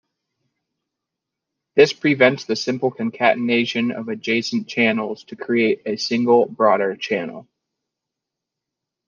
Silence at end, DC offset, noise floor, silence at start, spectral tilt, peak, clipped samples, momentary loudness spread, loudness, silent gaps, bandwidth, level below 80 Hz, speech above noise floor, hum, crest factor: 1.65 s; under 0.1%; -84 dBFS; 1.75 s; -5 dB/octave; -2 dBFS; under 0.1%; 9 LU; -19 LUFS; none; 7.2 kHz; -70 dBFS; 64 dB; none; 20 dB